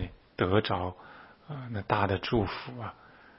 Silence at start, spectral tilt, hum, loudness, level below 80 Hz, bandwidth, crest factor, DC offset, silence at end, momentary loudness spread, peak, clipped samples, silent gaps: 0 s; -9.5 dB/octave; none; -31 LUFS; -52 dBFS; 5.8 kHz; 24 dB; under 0.1%; 0.3 s; 17 LU; -8 dBFS; under 0.1%; none